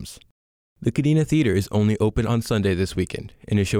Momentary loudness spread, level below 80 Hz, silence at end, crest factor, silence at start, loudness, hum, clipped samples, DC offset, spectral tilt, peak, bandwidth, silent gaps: 9 LU; -42 dBFS; 0 s; 14 dB; 0 s; -22 LUFS; none; under 0.1%; under 0.1%; -6.5 dB/octave; -8 dBFS; 16 kHz; 0.31-0.76 s